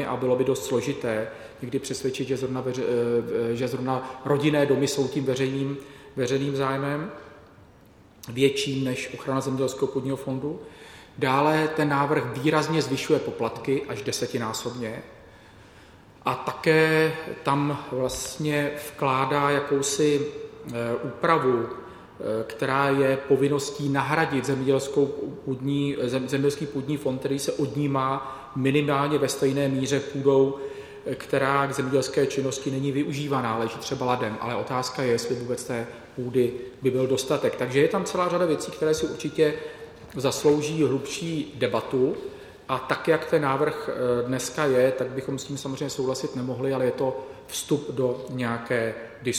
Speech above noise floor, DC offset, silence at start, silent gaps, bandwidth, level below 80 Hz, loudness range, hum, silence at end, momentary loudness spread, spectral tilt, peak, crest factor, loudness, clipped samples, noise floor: 28 dB; under 0.1%; 0 s; none; 16 kHz; -58 dBFS; 4 LU; none; 0 s; 10 LU; -5 dB/octave; -6 dBFS; 20 dB; -26 LUFS; under 0.1%; -53 dBFS